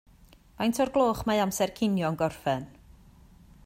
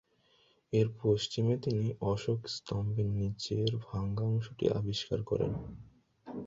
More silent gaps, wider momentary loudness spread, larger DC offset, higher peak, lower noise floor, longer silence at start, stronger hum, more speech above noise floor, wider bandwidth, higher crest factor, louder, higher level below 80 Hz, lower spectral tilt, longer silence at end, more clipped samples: neither; about the same, 6 LU vs 6 LU; neither; first, -12 dBFS vs -16 dBFS; second, -56 dBFS vs -69 dBFS; about the same, 0.6 s vs 0.7 s; neither; second, 29 dB vs 36 dB; first, 16 kHz vs 7.8 kHz; about the same, 16 dB vs 18 dB; first, -28 LUFS vs -33 LUFS; about the same, -54 dBFS vs -56 dBFS; second, -5 dB/octave vs -7 dB/octave; first, 0.95 s vs 0 s; neither